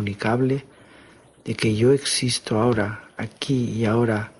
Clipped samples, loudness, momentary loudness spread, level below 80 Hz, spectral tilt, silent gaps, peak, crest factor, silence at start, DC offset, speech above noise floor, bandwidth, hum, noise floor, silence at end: under 0.1%; -22 LUFS; 13 LU; -52 dBFS; -5 dB/octave; none; -6 dBFS; 16 dB; 0 s; under 0.1%; 29 dB; 11.5 kHz; none; -50 dBFS; 0.1 s